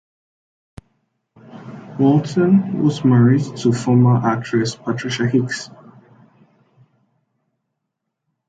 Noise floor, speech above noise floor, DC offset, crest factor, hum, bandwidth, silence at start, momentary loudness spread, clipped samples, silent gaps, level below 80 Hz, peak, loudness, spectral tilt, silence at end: -78 dBFS; 62 dB; under 0.1%; 16 dB; none; 9 kHz; 1.55 s; 18 LU; under 0.1%; none; -58 dBFS; -2 dBFS; -17 LUFS; -7 dB/octave; 2.85 s